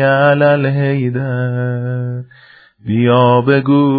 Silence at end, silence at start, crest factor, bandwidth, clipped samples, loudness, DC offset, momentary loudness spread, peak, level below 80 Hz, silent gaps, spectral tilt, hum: 0 s; 0 s; 14 dB; 4.9 kHz; under 0.1%; -14 LUFS; under 0.1%; 11 LU; 0 dBFS; -56 dBFS; none; -11 dB/octave; none